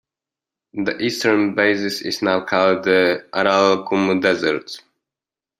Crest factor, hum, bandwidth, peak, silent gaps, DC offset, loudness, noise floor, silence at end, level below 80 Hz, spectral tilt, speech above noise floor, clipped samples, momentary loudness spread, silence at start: 18 dB; none; 15 kHz; -2 dBFS; none; under 0.1%; -18 LUFS; -89 dBFS; 0.8 s; -64 dBFS; -4.5 dB/octave; 71 dB; under 0.1%; 9 LU; 0.75 s